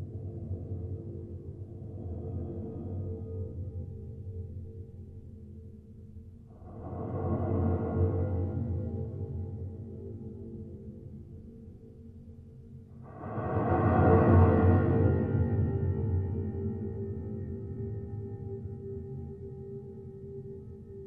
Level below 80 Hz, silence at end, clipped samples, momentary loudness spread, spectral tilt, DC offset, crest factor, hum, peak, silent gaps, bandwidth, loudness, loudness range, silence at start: -48 dBFS; 0 s; under 0.1%; 23 LU; -12.5 dB/octave; under 0.1%; 22 dB; none; -10 dBFS; none; 3.2 kHz; -32 LUFS; 18 LU; 0 s